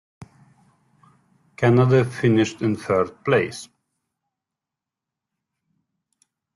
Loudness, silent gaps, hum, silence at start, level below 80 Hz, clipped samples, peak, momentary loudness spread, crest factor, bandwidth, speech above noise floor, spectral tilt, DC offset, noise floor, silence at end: -20 LUFS; none; none; 0.2 s; -60 dBFS; under 0.1%; -6 dBFS; 8 LU; 18 dB; 11.5 kHz; 68 dB; -7 dB/octave; under 0.1%; -87 dBFS; 2.9 s